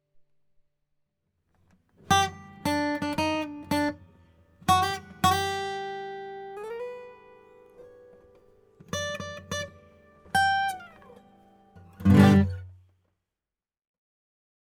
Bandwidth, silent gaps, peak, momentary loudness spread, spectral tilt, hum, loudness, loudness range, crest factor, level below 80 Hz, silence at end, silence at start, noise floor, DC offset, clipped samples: 19.5 kHz; none; -4 dBFS; 18 LU; -5 dB/octave; none; -26 LUFS; 13 LU; 24 dB; -56 dBFS; 2.05 s; 2.1 s; under -90 dBFS; under 0.1%; under 0.1%